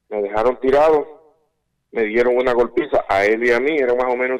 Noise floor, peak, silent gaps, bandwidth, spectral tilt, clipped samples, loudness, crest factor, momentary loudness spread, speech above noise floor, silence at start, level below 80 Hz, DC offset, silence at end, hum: -69 dBFS; -8 dBFS; none; 10 kHz; -5.5 dB/octave; under 0.1%; -17 LUFS; 10 dB; 7 LU; 53 dB; 0.1 s; -44 dBFS; under 0.1%; 0 s; none